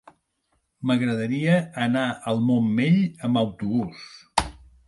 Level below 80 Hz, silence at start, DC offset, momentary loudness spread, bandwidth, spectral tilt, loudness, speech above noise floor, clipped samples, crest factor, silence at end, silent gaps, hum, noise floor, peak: -50 dBFS; 0.8 s; under 0.1%; 7 LU; 11.5 kHz; -6.5 dB/octave; -24 LUFS; 49 dB; under 0.1%; 20 dB; 0.35 s; none; none; -72 dBFS; -4 dBFS